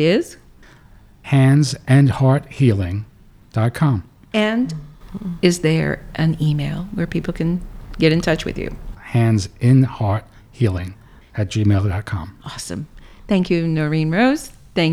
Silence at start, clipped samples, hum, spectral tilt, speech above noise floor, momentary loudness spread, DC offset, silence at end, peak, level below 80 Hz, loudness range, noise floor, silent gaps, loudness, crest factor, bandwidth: 0 s; under 0.1%; none; -6.5 dB/octave; 29 dB; 16 LU; under 0.1%; 0 s; -2 dBFS; -40 dBFS; 4 LU; -46 dBFS; none; -19 LUFS; 18 dB; 13.5 kHz